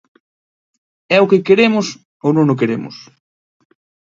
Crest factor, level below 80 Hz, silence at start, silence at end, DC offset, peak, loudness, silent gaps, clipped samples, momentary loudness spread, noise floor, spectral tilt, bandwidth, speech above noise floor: 18 dB; -64 dBFS; 1.1 s; 1.1 s; under 0.1%; 0 dBFS; -14 LUFS; 2.05-2.20 s; under 0.1%; 13 LU; under -90 dBFS; -6 dB/octave; 7.6 kHz; over 76 dB